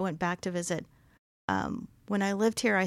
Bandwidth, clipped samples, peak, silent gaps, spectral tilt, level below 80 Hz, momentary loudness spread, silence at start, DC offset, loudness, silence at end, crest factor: 15 kHz; under 0.1%; -14 dBFS; 1.19-1.48 s; -5 dB/octave; -62 dBFS; 10 LU; 0 s; under 0.1%; -31 LUFS; 0 s; 18 dB